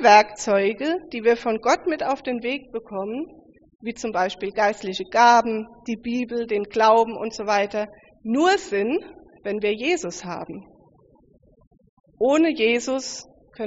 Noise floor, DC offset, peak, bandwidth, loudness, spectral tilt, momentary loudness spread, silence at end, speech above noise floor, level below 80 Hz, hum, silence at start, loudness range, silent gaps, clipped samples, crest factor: -56 dBFS; under 0.1%; -2 dBFS; 8 kHz; -22 LUFS; -2 dB/octave; 16 LU; 0 s; 35 dB; -60 dBFS; none; 0 s; 6 LU; 3.75-3.79 s, 11.67-11.71 s, 11.89-12.04 s; under 0.1%; 20 dB